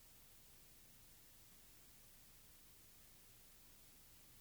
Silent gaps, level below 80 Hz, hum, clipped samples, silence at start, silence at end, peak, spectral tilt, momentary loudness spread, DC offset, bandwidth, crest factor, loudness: none; -72 dBFS; none; under 0.1%; 0 s; 0 s; -50 dBFS; -2 dB/octave; 0 LU; under 0.1%; over 20 kHz; 14 dB; -62 LUFS